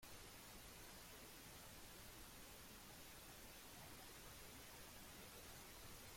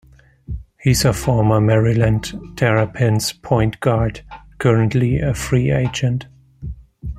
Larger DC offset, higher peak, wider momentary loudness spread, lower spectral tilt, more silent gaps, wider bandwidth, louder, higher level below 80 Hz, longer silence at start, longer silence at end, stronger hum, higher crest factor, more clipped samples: neither; second, -44 dBFS vs -2 dBFS; second, 1 LU vs 18 LU; second, -2.5 dB/octave vs -6 dB/octave; neither; about the same, 16.5 kHz vs 15 kHz; second, -58 LUFS vs -18 LUFS; second, -68 dBFS vs -34 dBFS; second, 0 s vs 0.5 s; about the same, 0 s vs 0 s; neither; about the same, 14 dB vs 16 dB; neither